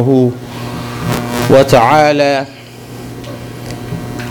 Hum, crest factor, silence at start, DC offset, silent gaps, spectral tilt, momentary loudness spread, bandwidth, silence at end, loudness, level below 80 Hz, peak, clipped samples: none; 14 dB; 0 s; under 0.1%; none; -6 dB/octave; 20 LU; 19.5 kHz; 0 s; -12 LUFS; -40 dBFS; 0 dBFS; under 0.1%